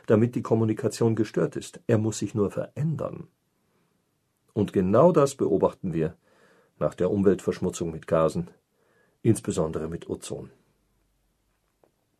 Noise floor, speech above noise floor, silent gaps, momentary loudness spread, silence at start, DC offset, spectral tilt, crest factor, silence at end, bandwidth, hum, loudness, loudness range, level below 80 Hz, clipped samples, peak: -73 dBFS; 48 dB; none; 12 LU; 0.1 s; under 0.1%; -7 dB/octave; 20 dB; 1.7 s; 13 kHz; none; -26 LUFS; 6 LU; -58 dBFS; under 0.1%; -6 dBFS